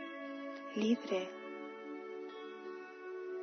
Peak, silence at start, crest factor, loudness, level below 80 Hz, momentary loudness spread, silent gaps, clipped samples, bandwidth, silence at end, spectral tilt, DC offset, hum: -22 dBFS; 0 s; 20 dB; -41 LUFS; under -90 dBFS; 13 LU; none; under 0.1%; 6.4 kHz; 0 s; -4 dB/octave; under 0.1%; none